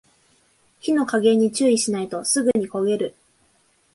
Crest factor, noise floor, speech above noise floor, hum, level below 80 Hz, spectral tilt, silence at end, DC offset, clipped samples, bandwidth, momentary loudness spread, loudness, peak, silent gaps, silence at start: 16 dB; -62 dBFS; 42 dB; none; -66 dBFS; -4 dB/octave; 0.85 s; under 0.1%; under 0.1%; 11.5 kHz; 7 LU; -21 LUFS; -6 dBFS; none; 0.85 s